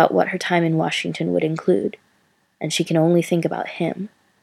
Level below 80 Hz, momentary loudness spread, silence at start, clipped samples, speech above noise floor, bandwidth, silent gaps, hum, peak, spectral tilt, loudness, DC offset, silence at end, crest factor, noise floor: -70 dBFS; 10 LU; 0 s; under 0.1%; 43 dB; 13.5 kHz; none; none; 0 dBFS; -5.5 dB/octave; -21 LUFS; under 0.1%; 0.35 s; 20 dB; -63 dBFS